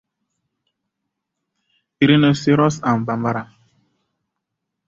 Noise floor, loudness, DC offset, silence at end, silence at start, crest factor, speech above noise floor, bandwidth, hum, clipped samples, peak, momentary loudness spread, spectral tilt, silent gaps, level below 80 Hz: -79 dBFS; -17 LUFS; under 0.1%; 1.45 s; 2 s; 20 dB; 63 dB; 7.8 kHz; none; under 0.1%; -2 dBFS; 9 LU; -6.5 dB/octave; none; -58 dBFS